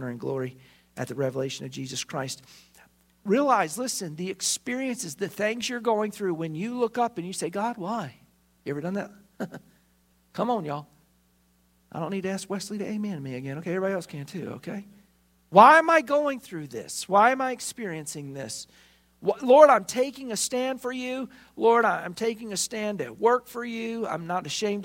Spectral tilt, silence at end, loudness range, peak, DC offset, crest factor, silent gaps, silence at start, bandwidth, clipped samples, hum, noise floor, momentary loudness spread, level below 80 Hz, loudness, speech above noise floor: -4 dB/octave; 0 s; 12 LU; -2 dBFS; under 0.1%; 26 dB; none; 0 s; 16 kHz; under 0.1%; none; -65 dBFS; 16 LU; -70 dBFS; -26 LUFS; 39 dB